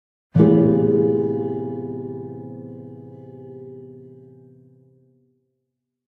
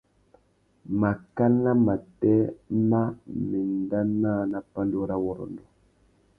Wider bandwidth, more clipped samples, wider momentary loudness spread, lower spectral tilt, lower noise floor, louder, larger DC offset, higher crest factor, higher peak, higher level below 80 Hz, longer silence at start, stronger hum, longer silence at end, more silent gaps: first, 3.7 kHz vs 2.8 kHz; neither; first, 25 LU vs 9 LU; about the same, -12 dB/octave vs -12 dB/octave; first, -79 dBFS vs -64 dBFS; first, -19 LUFS vs -26 LUFS; neither; first, 22 dB vs 16 dB; first, -2 dBFS vs -10 dBFS; about the same, -60 dBFS vs -56 dBFS; second, 0.35 s vs 0.85 s; neither; first, 2 s vs 0.8 s; neither